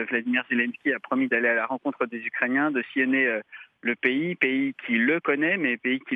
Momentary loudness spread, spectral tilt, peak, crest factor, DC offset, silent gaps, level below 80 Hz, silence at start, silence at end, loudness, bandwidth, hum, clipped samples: 7 LU; -7.5 dB/octave; -6 dBFS; 18 dB; under 0.1%; none; -86 dBFS; 0 s; 0 s; -25 LUFS; 3.9 kHz; none; under 0.1%